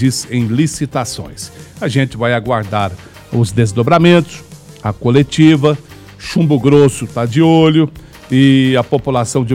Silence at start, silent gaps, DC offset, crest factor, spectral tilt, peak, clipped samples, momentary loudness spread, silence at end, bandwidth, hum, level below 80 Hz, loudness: 0 s; none; under 0.1%; 12 dB; -6 dB/octave; 0 dBFS; 0.2%; 14 LU; 0 s; 15 kHz; none; -42 dBFS; -13 LUFS